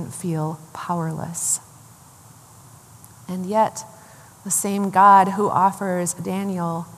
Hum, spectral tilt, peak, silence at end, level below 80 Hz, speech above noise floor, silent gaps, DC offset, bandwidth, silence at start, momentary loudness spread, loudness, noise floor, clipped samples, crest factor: none; -4.5 dB/octave; -2 dBFS; 0 s; -66 dBFS; 27 dB; none; under 0.1%; 15 kHz; 0 s; 19 LU; -20 LUFS; -47 dBFS; under 0.1%; 20 dB